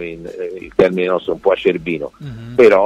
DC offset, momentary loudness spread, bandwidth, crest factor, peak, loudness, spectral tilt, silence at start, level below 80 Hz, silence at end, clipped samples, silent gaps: under 0.1%; 15 LU; 9.8 kHz; 14 dB; -2 dBFS; -17 LUFS; -7 dB/octave; 0 s; -48 dBFS; 0 s; under 0.1%; none